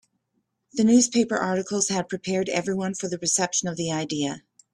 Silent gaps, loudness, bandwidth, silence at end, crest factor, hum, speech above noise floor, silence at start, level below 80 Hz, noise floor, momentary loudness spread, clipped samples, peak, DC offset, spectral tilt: none; -24 LUFS; 12.5 kHz; 0.35 s; 18 dB; none; 51 dB; 0.75 s; -64 dBFS; -75 dBFS; 10 LU; under 0.1%; -6 dBFS; under 0.1%; -3.5 dB/octave